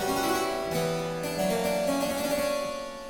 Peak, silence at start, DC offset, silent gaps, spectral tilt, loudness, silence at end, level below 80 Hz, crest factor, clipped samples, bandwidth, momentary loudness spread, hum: -14 dBFS; 0 s; under 0.1%; none; -4 dB/octave; -28 LUFS; 0 s; -52 dBFS; 14 dB; under 0.1%; 18 kHz; 4 LU; none